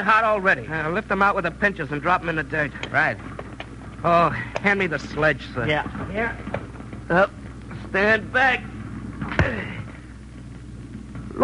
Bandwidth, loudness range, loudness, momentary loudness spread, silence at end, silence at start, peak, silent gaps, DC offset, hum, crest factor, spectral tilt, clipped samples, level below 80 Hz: 10.5 kHz; 2 LU; -22 LUFS; 18 LU; 0 s; 0 s; -4 dBFS; none; under 0.1%; none; 18 dB; -6 dB/octave; under 0.1%; -42 dBFS